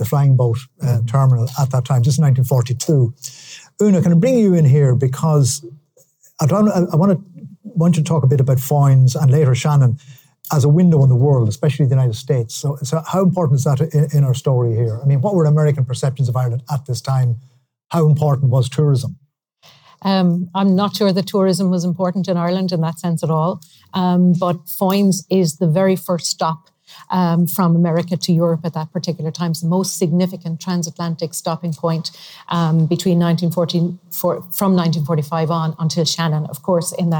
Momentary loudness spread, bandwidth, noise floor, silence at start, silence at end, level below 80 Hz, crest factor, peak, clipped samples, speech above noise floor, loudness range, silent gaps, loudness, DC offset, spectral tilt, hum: 9 LU; over 20 kHz; -53 dBFS; 0 s; 0 s; -60 dBFS; 10 dB; -6 dBFS; under 0.1%; 37 dB; 4 LU; none; -17 LUFS; under 0.1%; -7 dB/octave; none